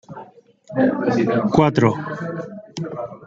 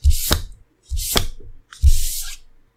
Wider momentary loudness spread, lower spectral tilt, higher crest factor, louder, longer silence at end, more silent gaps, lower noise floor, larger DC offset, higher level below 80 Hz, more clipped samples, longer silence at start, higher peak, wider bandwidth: about the same, 16 LU vs 16 LU; first, -7.5 dB/octave vs -3 dB/octave; about the same, 20 dB vs 20 dB; about the same, -20 LUFS vs -21 LUFS; second, 0 s vs 0.4 s; neither; first, -42 dBFS vs -37 dBFS; neither; second, -52 dBFS vs -20 dBFS; neither; about the same, 0.1 s vs 0.05 s; about the same, -2 dBFS vs 0 dBFS; second, 7.8 kHz vs 16.5 kHz